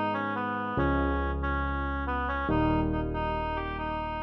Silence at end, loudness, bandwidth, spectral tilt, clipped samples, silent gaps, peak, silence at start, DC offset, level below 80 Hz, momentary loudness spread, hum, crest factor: 0 s; -30 LUFS; 5.6 kHz; -9 dB/octave; under 0.1%; none; -14 dBFS; 0 s; under 0.1%; -36 dBFS; 5 LU; none; 14 dB